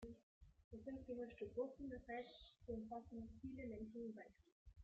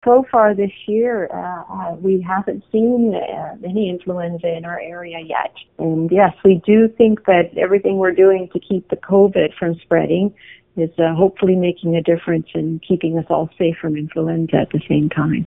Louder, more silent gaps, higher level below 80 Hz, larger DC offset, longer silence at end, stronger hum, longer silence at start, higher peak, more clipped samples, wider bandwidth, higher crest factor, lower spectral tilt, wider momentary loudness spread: second, -53 LUFS vs -17 LUFS; first, 0.23-0.41 s, 0.64-0.71 s, 4.52-4.66 s vs none; second, -70 dBFS vs -52 dBFS; second, under 0.1% vs 0.1%; about the same, 0 s vs 0 s; neither; about the same, 0 s vs 0.05 s; second, -36 dBFS vs 0 dBFS; neither; first, 7.6 kHz vs 3.8 kHz; about the same, 18 dB vs 16 dB; second, -6 dB/octave vs -10 dB/octave; about the same, 12 LU vs 11 LU